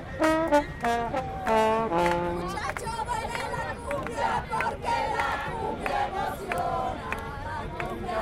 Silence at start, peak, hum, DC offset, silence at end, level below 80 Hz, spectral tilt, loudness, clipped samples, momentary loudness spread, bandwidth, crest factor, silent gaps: 0 s; -8 dBFS; none; under 0.1%; 0 s; -44 dBFS; -5 dB/octave; -28 LUFS; under 0.1%; 9 LU; 16.5 kHz; 20 dB; none